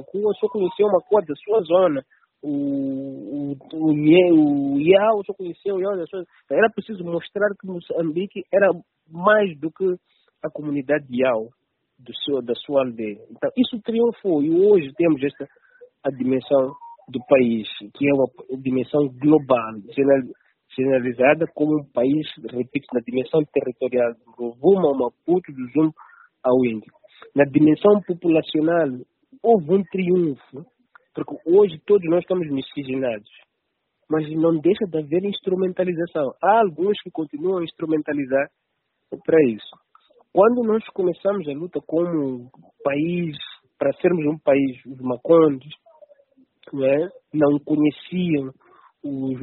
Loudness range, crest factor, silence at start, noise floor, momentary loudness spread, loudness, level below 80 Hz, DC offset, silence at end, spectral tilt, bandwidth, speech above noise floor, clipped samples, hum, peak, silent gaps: 5 LU; 20 dB; 0 s; -75 dBFS; 14 LU; -21 LUFS; -66 dBFS; under 0.1%; 0 s; -5.5 dB/octave; 4.2 kHz; 55 dB; under 0.1%; none; 0 dBFS; none